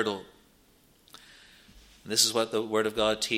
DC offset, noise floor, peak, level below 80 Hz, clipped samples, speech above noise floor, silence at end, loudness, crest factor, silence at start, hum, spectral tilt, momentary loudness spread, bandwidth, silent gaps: under 0.1%; -62 dBFS; -8 dBFS; -62 dBFS; under 0.1%; 34 dB; 0 s; -27 LUFS; 24 dB; 0 s; none; -2 dB/octave; 8 LU; 16.5 kHz; none